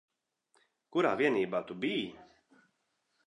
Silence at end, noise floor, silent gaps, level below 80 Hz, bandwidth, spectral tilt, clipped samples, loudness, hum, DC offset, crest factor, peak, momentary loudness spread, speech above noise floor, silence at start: 1.05 s; -79 dBFS; none; -78 dBFS; 10.5 kHz; -6 dB/octave; under 0.1%; -32 LUFS; none; under 0.1%; 22 dB; -14 dBFS; 8 LU; 48 dB; 0.9 s